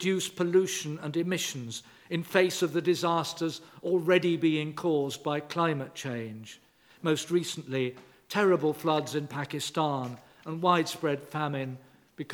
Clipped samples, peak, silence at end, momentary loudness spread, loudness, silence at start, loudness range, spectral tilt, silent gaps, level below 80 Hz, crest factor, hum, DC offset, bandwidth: under 0.1%; -8 dBFS; 0 s; 13 LU; -29 LUFS; 0 s; 3 LU; -5 dB/octave; none; -78 dBFS; 22 dB; none; under 0.1%; 19 kHz